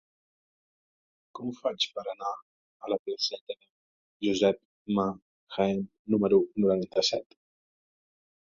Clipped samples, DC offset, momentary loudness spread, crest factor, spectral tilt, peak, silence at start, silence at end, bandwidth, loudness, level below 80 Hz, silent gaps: under 0.1%; under 0.1%; 16 LU; 22 dB; -5 dB/octave; -10 dBFS; 1.35 s; 1.35 s; 7.6 kHz; -29 LUFS; -68 dBFS; 2.42-2.80 s, 2.99-3.05 s, 3.41-3.47 s, 3.70-4.20 s, 4.65-4.85 s, 5.22-5.47 s, 5.99-6.05 s